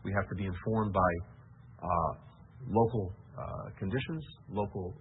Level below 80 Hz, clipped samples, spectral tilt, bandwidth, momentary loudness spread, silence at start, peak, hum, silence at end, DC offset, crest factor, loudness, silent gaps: -52 dBFS; under 0.1%; -4.5 dB/octave; 3.9 kHz; 14 LU; 0 s; -14 dBFS; none; 0 s; under 0.1%; 20 dB; -34 LUFS; none